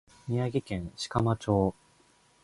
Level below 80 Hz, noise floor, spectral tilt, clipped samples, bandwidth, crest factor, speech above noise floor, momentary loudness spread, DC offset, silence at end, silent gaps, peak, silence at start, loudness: -50 dBFS; -64 dBFS; -7 dB/octave; under 0.1%; 11.5 kHz; 20 dB; 35 dB; 8 LU; under 0.1%; 0.7 s; none; -10 dBFS; 0.25 s; -30 LUFS